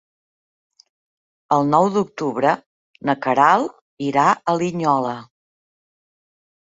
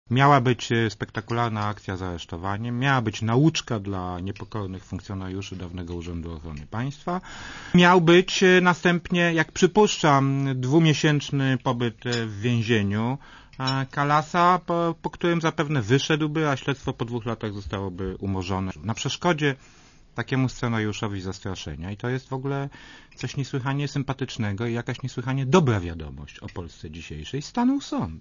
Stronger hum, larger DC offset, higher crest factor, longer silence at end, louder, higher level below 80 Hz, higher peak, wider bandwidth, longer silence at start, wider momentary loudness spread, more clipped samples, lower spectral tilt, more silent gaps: neither; neither; about the same, 20 dB vs 20 dB; first, 1.4 s vs 0 s; first, -19 LUFS vs -24 LUFS; second, -66 dBFS vs -48 dBFS; about the same, -2 dBFS vs -4 dBFS; about the same, 8 kHz vs 7.4 kHz; first, 1.5 s vs 0.1 s; second, 12 LU vs 16 LU; neither; about the same, -6 dB/octave vs -5.5 dB/octave; first, 2.66-2.94 s, 3.81-3.97 s vs none